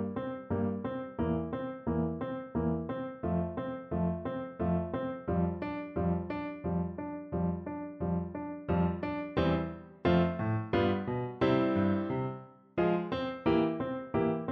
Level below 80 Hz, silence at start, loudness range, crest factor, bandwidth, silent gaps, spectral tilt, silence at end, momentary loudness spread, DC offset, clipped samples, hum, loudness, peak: -52 dBFS; 0 s; 4 LU; 18 dB; 5.8 kHz; none; -10 dB/octave; 0 s; 9 LU; under 0.1%; under 0.1%; none; -33 LUFS; -14 dBFS